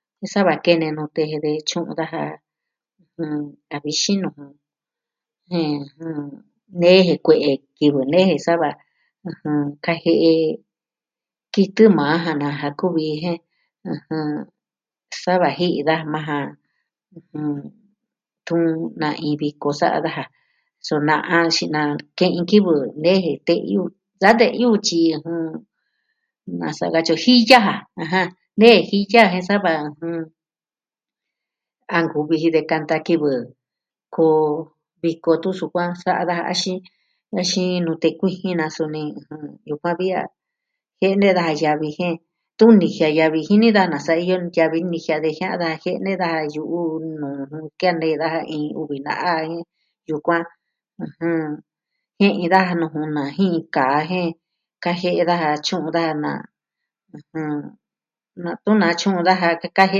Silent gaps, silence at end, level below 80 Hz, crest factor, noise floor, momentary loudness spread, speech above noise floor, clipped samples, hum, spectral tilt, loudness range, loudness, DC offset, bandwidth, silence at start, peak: none; 0 s; -68 dBFS; 20 dB; under -90 dBFS; 16 LU; over 71 dB; under 0.1%; none; -5.5 dB/octave; 8 LU; -19 LUFS; under 0.1%; 10 kHz; 0.2 s; 0 dBFS